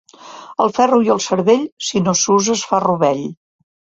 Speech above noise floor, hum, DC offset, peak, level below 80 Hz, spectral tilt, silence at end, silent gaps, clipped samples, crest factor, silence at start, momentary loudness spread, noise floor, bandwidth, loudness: 22 dB; none; under 0.1%; 0 dBFS; -58 dBFS; -4 dB/octave; 0.65 s; 1.72-1.77 s; under 0.1%; 16 dB; 0.25 s; 10 LU; -37 dBFS; 8 kHz; -16 LUFS